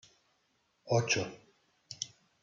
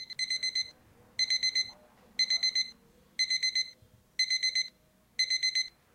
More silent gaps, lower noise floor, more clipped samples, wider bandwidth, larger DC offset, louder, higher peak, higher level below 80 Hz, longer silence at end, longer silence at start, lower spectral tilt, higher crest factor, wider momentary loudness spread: neither; first, -76 dBFS vs -65 dBFS; neither; second, 7.8 kHz vs 16 kHz; neither; second, -34 LUFS vs -29 LUFS; about the same, -16 dBFS vs -16 dBFS; about the same, -74 dBFS vs -72 dBFS; about the same, 0.35 s vs 0.25 s; first, 0.85 s vs 0 s; first, -3.5 dB/octave vs 3 dB/octave; first, 22 dB vs 16 dB; about the same, 13 LU vs 13 LU